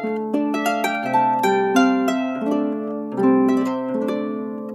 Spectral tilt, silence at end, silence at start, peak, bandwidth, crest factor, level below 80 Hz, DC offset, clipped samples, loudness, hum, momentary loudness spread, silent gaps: -5.5 dB/octave; 0 s; 0 s; -6 dBFS; 15 kHz; 16 dB; -74 dBFS; under 0.1%; under 0.1%; -20 LUFS; none; 8 LU; none